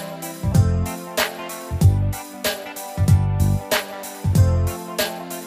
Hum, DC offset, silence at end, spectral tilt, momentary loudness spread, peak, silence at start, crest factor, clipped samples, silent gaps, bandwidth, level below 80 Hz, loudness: none; under 0.1%; 0 s; -5.5 dB/octave; 11 LU; -4 dBFS; 0 s; 16 dB; under 0.1%; none; 16 kHz; -32 dBFS; -21 LUFS